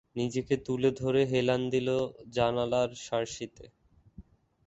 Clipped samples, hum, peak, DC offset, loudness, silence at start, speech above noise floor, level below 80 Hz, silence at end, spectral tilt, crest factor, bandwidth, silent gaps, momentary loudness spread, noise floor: under 0.1%; none; -12 dBFS; under 0.1%; -30 LUFS; 0.15 s; 25 dB; -60 dBFS; 0.45 s; -6 dB/octave; 20 dB; 8.2 kHz; none; 7 LU; -54 dBFS